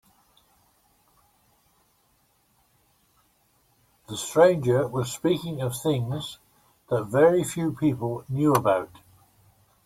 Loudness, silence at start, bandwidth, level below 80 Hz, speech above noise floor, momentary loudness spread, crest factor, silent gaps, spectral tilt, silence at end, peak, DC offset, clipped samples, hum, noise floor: -24 LUFS; 4.1 s; 16.5 kHz; -62 dBFS; 43 dB; 14 LU; 22 dB; none; -6 dB/octave; 1 s; -6 dBFS; under 0.1%; under 0.1%; none; -66 dBFS